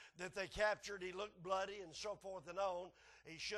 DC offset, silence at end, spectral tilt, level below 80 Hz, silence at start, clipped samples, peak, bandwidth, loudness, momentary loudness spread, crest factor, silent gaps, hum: under 0.1%; 0 s; -3 dB/octave; -68 dBFS; 0 s; under 0.1%; -26 dBFS; 12 kHz; -45 LUFS; 11 LU; 20 dB; none; none